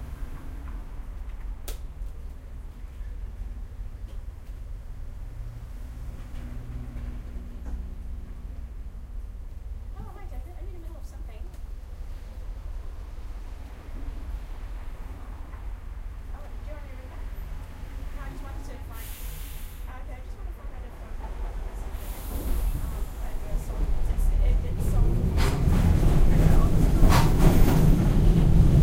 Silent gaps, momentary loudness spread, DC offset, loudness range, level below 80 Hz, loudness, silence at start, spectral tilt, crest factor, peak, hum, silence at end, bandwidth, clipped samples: none; 20 LU; under 0.1%; 18 LU; -28 dBFS; -28 LUFS; 0 s; -7 dB/octave; 20 dB; -6 dBFS; none; 0 s; 16 kHz; under 0.1%